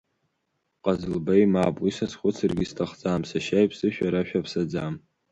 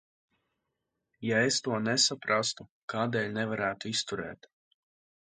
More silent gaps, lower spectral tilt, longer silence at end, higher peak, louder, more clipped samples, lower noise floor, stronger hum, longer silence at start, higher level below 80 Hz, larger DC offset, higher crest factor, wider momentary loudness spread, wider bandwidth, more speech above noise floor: second, none vs 2.69-2.88 s; first, -7 dB/octave vs -3 dB/octave; second, 0.35 s vs 0.95 s; first, -8 dBFS vs -12 dBFS; first, -25 LUFS vs -30 LUFS; neither; second, -76 dBFS vs -84 dBFS; neither; second, 0.85 s vs 1.2 s; first, -52 dBFS vs -70 dBFS; neither; about the same, 18 dB vs 20 dB; second, 9 LU vs 13 LU; about the same, 9.2 kHz vs 9.6 kHz; about the same, 52 dB vs 53 dB